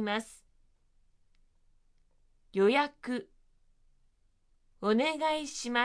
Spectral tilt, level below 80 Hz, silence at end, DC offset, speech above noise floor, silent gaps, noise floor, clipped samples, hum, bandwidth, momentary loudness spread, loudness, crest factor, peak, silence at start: -4 dB/octave; -66 dBFS; 0 s; under 0.1%; 38 dB; none; -68 dBFS; under 0.1%; none; 11 kHz; 12 LU; -31 LUFS; 20 dB; -14 dBFS; 0 s